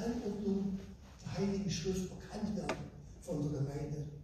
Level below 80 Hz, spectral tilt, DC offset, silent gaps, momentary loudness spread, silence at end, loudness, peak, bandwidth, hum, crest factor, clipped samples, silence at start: -54 dBFS; -6 dB/octave; under 0.1%; none; 10 LU; 0 s; -39 LUFS; -22 dBFS; 14 kHz; none; 18 dB; under 0.1%; 0 s